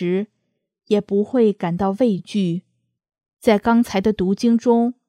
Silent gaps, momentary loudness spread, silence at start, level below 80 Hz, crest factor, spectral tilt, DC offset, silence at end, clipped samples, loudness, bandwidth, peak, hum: none; 7 LU; 0 s; -52 dBFS; 18 dB; -7 dB/octave; under 0.1%; 0.15 s; under 0.1%; -19 LUFS; 13.5 kHz; -2 dBFS; none